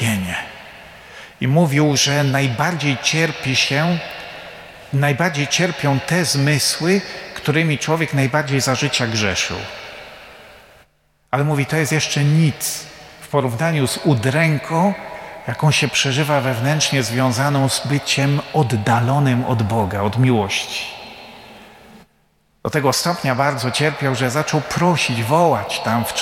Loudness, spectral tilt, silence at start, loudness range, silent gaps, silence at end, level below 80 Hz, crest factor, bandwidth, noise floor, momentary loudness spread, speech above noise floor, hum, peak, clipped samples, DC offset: -18 LUFS; -4.5 dB/octave; 0 s; 4 LU; none; 0 s; -52 dBFS; 16 dB; 16.5 kHz; -60 dBFS; 15 LU; 42 dB; none; -2 dBFS; under 0.1%; under 0.1%